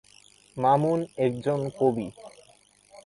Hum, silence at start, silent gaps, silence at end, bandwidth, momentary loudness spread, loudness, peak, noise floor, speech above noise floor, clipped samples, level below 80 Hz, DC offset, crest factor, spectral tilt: none; 0.55 s; none; 0.1 s; 11.5 kHz; 12 LU; -26 LUFS; -10 dBFS; -59 dBFS; 34 dB; under 0.1%; -64 dBFS; under 0.1%; 18 dB; -7.5 dB/octave